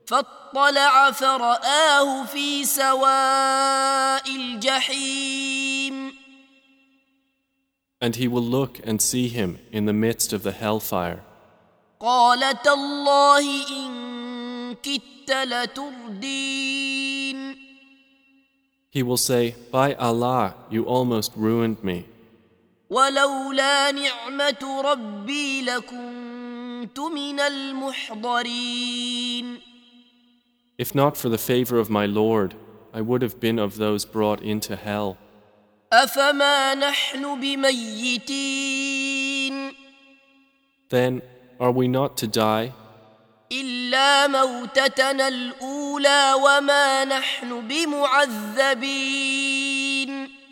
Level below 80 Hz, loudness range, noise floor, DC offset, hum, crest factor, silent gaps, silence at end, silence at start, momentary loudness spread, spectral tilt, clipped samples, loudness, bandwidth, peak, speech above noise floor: -62 dBFS; 7 LU; -75 dBFS; under 0.1%; none; 22 dB; none; 0.15 s; 0.05 s; 13 LU; -3 dB/octave; under 0.1%; -21 LUFS; over 20 kHz; -2 dBFS; 53 dB